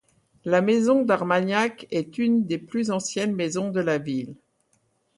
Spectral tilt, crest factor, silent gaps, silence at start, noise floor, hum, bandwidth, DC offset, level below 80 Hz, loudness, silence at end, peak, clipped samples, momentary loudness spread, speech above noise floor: -5.5 dB/octave; 16 dB; none; 0.45 s; -68 dBFS; none; 11.5 kHz; under 0.1%; -68 dBFS; -24 LUFS; 0.85 s; -8 dBFS; under 0.1%; 10 LU; 45 dB